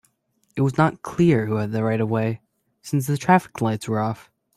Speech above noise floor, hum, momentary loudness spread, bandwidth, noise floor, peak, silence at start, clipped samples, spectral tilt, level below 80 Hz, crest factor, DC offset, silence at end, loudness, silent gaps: 47 dB; none; 11 LU; 15 kHz; -68 dBFS; -4 dBFS; 0.55 s; under 0.1%; -7 dB/octave; -56 dBFS; 20 dB; under 0.1%; 0.4 s; -22 LUFS; none